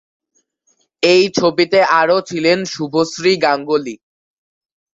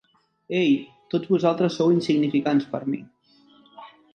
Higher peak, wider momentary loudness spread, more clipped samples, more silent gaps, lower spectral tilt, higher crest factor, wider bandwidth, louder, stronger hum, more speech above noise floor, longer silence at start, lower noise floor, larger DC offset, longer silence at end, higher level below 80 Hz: first, 0 dBFS vs -6 dBFS; about the same, 7 LU vs 9 LU; neither; neither; second, -4 dB/octave vs -7 dB/octave; about the same, 16 dB vs 18 dB; second, 7.8 kHz vs 9 kHz; first, -15 LUFS vs -23 LUFS; neither; first, 49 dB vs 35 dB; first, 1 s vs 0.5 s; first, -63 dBFS vs -57 dBFS; neither; first, 1 s vs 0.25 s; first, -60 dBFS vs -70 dBFS